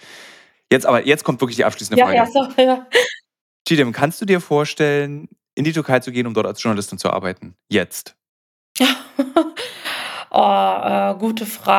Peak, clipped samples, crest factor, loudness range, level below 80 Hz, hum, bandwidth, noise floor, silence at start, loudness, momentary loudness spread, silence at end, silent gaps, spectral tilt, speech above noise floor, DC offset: 0 dBFS; under 0.1%; 18 dB; 5 LU; -66 dBFS; none; 17.5 kHz; -45 dBFS; 0.1 s; -18 LUFS; 12 LU; 0 s; 3.41-3.65 s, 5.53-5.57 s, 8.29-8.75 s; -4.5 dB/octave; 28 dB; under 0.1%